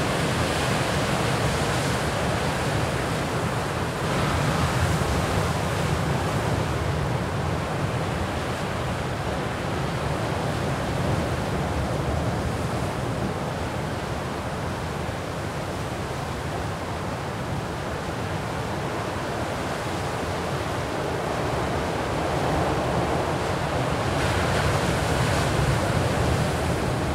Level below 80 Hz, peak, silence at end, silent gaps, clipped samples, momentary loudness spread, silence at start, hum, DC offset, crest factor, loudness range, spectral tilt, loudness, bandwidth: -38 dBFS; -10 dBFS; 0 s; none; under 0.1%; 6 LU; 0 s; none; under 0.1%; 16 dB; 6 LU; -5.5 dB/octave; -26 LUFS; 16 kHz